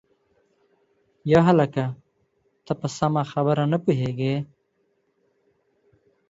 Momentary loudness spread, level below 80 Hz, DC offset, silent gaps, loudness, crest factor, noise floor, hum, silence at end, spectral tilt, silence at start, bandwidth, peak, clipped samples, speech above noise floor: 14 LU; -58 dBFS; under 0.1%; none; -23 LUFS; 20 dB; -70 dBFS; none; 1.85 s; -7.5 dB/octave; 1.25 s; 7.8 kHz; -4 dBFS; under 0.1%; 48 dB